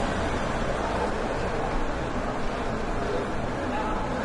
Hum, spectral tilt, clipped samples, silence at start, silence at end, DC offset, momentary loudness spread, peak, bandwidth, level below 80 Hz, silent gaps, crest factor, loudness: none; -5.5 dB/octave; under 0.1%; 0 s; 0 s; under 0.1%; 2 LU; -14 dBFS; 11.5 kHz; -34 dBFS; none; 12 dB; -29 LUFS